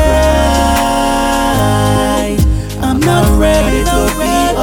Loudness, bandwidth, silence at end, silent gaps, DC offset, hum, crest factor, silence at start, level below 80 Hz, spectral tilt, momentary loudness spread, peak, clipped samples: -12 LUFS; 19.5 kHz; 0 s; none; under 0.1%; none; 10 dB; 0 s; -18 dBFS; -5 dB/octave; 3 LU; 0 dBFS; under 0.1%